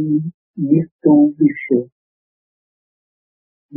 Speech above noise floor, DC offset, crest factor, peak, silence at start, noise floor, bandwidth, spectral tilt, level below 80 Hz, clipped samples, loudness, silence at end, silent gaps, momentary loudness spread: over 75 dB; under 0.1%; 18 dB; -2 dBFS; 0 s; under -90 dBFS; 2.7 kHz; -7.5 dB/octave; -64 dBFS; under 0.1%; -16 LUFS; 0 s; 0.34-0.54 s, 0.92-0.99 s, 1.92-3.69 s; 13 LU